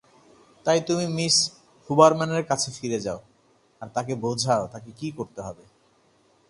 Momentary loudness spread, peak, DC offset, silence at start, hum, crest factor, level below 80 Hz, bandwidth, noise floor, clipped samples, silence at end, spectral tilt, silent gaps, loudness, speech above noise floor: 18 LU; 0 dBFS; under 0.1%; 0.65 s; none; 24 dB; -62 dBFS; 11.5 kHz; -62 dBFS; under 0.1%; 0.95 s; -4 dB/octave; none; -24 LUFS; 38 dB